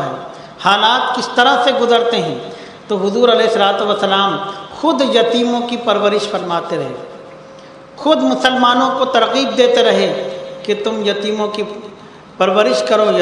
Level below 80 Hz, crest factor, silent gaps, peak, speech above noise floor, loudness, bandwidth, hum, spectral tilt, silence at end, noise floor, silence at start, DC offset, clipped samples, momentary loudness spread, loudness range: -60 dBFS; 14 dB; none; 0 dBFS; 23 dB; -14 LUFS; 11 kHz; none; -4 dB/octave; 0 s; -37 dBFS; 0 s; under 0.1%; under 0.1%; 14 LU; 3 LU